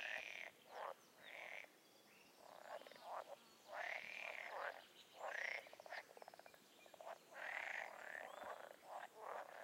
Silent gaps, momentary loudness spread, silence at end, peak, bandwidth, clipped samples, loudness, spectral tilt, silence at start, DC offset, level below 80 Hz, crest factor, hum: none; 15 LU; 0 s; -32 dBFS; 16 kHz; under 0.1%; -52 LUFS; -1 dB/octave; 0 s; under 0.1%; under -90 dBFS; 22 dB; none